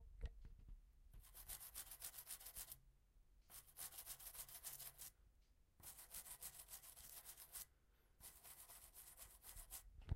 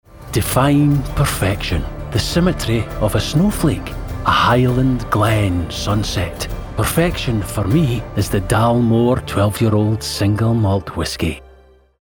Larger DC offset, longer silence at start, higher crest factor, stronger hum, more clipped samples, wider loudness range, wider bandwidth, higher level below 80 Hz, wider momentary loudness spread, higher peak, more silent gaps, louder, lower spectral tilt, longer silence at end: neither; second, 0 s vs 0.15 s; first, 26 dB vs 16 dB; neither; neither; about the same, 3 LU vs 2 LU; second, 16 kHz vs over 20 kHz; second, -66 dBFS vs -30 dBFS; about the same, 9 LU vs 8 LU; second, -32 dBFS vs -2 dBFS; neither; second, -56 LUFS vs -17 LUFS; second, -2 dB/octave vs -6 dB/octave; second, 0 s vs 0.6 s